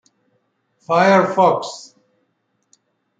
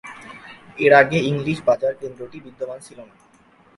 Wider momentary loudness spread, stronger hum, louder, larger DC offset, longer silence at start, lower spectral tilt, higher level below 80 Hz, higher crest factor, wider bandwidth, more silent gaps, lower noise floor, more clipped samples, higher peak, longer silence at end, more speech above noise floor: second, 17 LU vs 25 LU; neither; first, -15 LUFS vs -18 LUFS; neither; first, 0.9 s vs 0.05 s; about the same, -5.5 dB/octave vs -6 dB/octave; second, -68 dBFS vs -58 dBFS; about the same, 18 dB vs 20 dB; second, 9.2 kHz vs 11.5 kHz; neither; first, -68 dBFS vs -54 dBFS; neither; about the same, -2 dBFS vs 0 dBFS; first, 1.35 s vs 0.75 s; first, 53 dB vs 34 dB